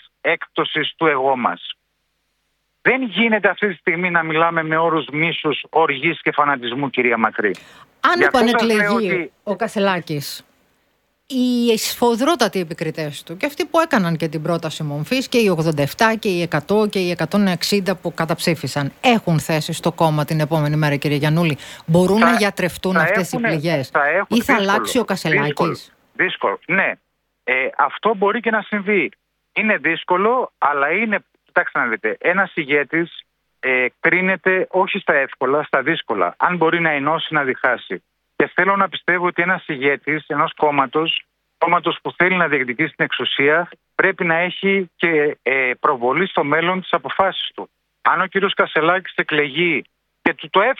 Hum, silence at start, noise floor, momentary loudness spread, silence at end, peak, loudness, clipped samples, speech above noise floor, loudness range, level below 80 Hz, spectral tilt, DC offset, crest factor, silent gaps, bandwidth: none; 0.25 s; -70 dBFS; 7 LU; 0.05 s; 0 dBFS; -18 LUFS; under 0.1%; 51 dB; 2 LU; -58 dBFS; -5 dB/octave; under 0.1%; 18 dB; none; 18.5 kHz